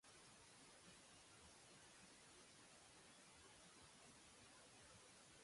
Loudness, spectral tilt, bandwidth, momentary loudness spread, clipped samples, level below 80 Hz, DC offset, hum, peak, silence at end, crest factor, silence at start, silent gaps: -65 LUFS; -2 dB/octave; 11.5 kHz; 1 LU; under 0.1%; -84 dBFS; under 0.1%; none; -52 dBFS; 0 s; 14 dB; 0.05 s; none